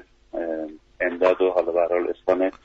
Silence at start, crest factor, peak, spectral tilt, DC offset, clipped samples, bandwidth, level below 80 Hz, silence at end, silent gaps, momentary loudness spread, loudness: 0.35 s; 16 dB; -8 dBFS; -6 dB/octave; under 0.1%; under 0.1%; 7.2 kHz; -58 dBFS; 0.15 s; none; 12 LU; -23 LUFS